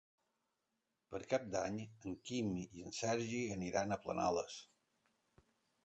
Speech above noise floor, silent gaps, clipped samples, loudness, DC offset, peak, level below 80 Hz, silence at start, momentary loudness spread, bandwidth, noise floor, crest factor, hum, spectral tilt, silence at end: 47 dB; none; under 0.1%; -41 LUFS; under 0.1%; -22 dBFS; -68 dBFS; 1.1 s; 11 LU; 8.8 kHz; -87 dBFS; 22 dB; none; -5 dB/octave; 1.2 s